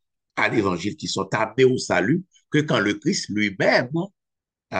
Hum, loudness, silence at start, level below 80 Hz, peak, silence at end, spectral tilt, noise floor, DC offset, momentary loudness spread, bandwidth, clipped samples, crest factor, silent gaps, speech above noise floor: none; -22 LUFS; 0.35 s; -62 dBFS; -4 dBFS; 0 s; -5 dB/octave; -86 dBFS; under 0.1%; 8 LU; 9.8 kHz; under 0.1%; 18 dB; none; 64 dB